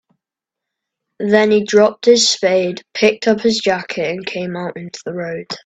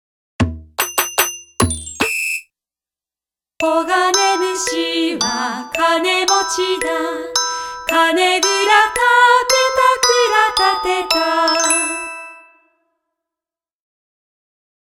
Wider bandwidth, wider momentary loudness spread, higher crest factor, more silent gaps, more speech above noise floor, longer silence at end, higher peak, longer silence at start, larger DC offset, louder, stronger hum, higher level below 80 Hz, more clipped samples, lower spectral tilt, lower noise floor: second, 9 kHz vs 18 kHz; first, 13 LU vs 9 LU; about the same, 16 dB vs 18 dB; neither; second, 68 dB vs over 74 dB; second, 0.1 s vs 2.6 s; about the same, 0 dBFS vs 0 dBFS; first, 1.2 s vs 0.4 s; neither; about the same, -15 LUFS vs -15 LUFS; neither; second, -60 dBFS vs -44 dBFS; neither; first, -3.5 dB/octave vs -2 dB/octave; second, -84 dBFS vs under -90 dBFS